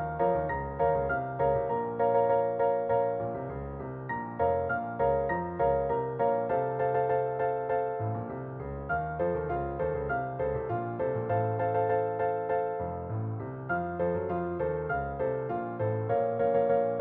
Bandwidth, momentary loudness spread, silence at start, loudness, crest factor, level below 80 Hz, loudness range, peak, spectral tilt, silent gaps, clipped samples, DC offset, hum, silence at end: 3.8 kHz; 8 LU; 0 s; -30 LUFS; 16 dB; -50 dBFS; 4 LU; -14 dBFS; -8 dB/octave; none; under 0.1%; under 0.1%; none; 0 s